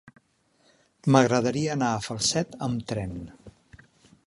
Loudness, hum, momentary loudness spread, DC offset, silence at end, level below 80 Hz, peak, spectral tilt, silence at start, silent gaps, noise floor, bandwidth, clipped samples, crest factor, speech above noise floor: -25 LUFS; none; 14 LU; under 0.1%; 0.75 s; -54 dBFS; -4 dBFS; -5 dB/octave; 0.05 s; none; -66 dBFS; 11.5 kHz; under 0.1%; 24 dB; 41 dB